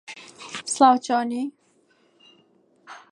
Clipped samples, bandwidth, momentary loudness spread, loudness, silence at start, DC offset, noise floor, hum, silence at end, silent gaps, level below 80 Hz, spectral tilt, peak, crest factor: under 0.1%; 11.5 kHz; 23 LU; -22 LUFS; 0.1 s; under 0.1%; -62 dBFS; none; 0.15 s; none; -82 dBFS; -2.5 dB/octave; -2 dBFS; 22 dB